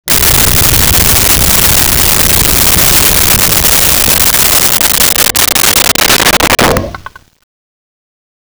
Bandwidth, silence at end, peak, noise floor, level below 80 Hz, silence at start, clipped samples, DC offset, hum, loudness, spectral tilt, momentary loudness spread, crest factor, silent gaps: over 20 kHz; 1.45 s; 0 dBFS; -28 dBFS; -22 dBFS; 0.05 s; under 0.1%; under 0.1%; none; -5 LUFS; -1.5 dB/octave; 1 LU; 8 dB; none